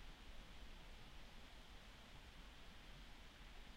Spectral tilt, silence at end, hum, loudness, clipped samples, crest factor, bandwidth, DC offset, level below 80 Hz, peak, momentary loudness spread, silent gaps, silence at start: -3.5 dB/octave; 0 s; none; -61 LUFS; under 0.1%; 14 dB; 16 kHz; under 0.1%; -60 dBFS; -44 dBFS; 1 LU; none; 0 s